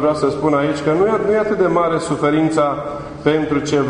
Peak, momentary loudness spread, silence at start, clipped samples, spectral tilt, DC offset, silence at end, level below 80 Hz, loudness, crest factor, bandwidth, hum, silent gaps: -2 dBFS; 4 LU; 0 s; under 0.1%; -6.5 dB/octave; under 0.1%; 0 s; -46 dBFS; -17 LUFS; 14 dB; 10 kHz; none; none